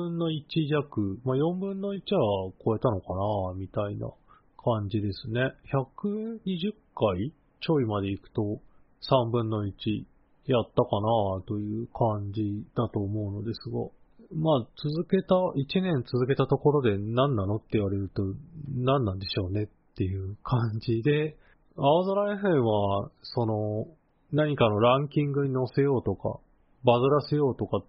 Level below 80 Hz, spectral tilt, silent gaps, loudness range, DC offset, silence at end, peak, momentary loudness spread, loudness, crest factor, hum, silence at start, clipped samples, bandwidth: -56 dBFS; -6.5 dB/octave; none; 4 LU; under 0.1%; 0.05 s; -6 dBFS; 10 LU; -28 LUFS; 20 dB; none; 0 s; under 0.1%; 5.6 kHz